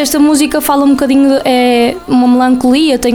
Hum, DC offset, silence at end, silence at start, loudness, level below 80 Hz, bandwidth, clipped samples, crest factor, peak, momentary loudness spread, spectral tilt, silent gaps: none; under 0.1%; 0 s; 0 s; -9 LUFS; -38 dBFS; 20 kHz; under 0.1%; 8 dB; 0 dBFS; 2 LU; -3.5 dB/octave; none